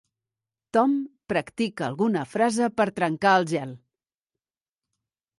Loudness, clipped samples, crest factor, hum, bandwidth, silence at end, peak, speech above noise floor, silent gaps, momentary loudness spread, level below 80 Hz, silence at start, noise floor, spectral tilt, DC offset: -24 LUFS; under 0.1%; 18 dB; none; 11.5 kHz; 1.6 s; -8 dBFS; over 66 dB; none; 8 LU; -68 dBFS; 0.75 s; under -90 dBFS; -5.5 dB/octave; under 0.1%